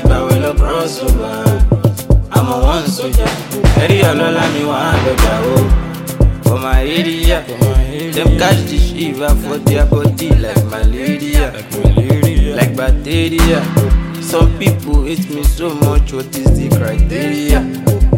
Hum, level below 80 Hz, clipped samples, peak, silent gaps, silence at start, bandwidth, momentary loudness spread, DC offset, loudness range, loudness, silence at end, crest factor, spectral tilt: none; -16 dBFS; under 0.1%; 0 dBFS; none; 0 s; 17 kHz; 4 LU; under 0.1%; 1 LU; -14 LUFS; 0 s; 12 dB; -6 dB/octave